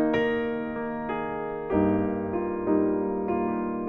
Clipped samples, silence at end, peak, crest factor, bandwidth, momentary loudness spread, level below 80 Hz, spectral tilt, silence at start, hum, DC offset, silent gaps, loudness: under 0.1%; 0 s; -10 dBFS; 16 dB; 5.2 kHz; 7 LU; -52 dBFS; -9 dB/octave; 0 s; none; under 0.1%; none; -27 LUFS